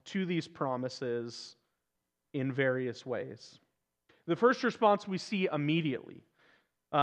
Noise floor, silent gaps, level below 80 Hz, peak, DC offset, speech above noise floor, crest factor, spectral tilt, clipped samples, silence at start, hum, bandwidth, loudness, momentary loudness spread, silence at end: -85 dBFS; none; -86 dBFS; -12 dBFS; under 0.1%; 53 dB; 22 dB; -6 dB/octave; under 0.1%; 0.05 s; none; 9.6 kHz; -33 LUFS; 17 LU; 0 s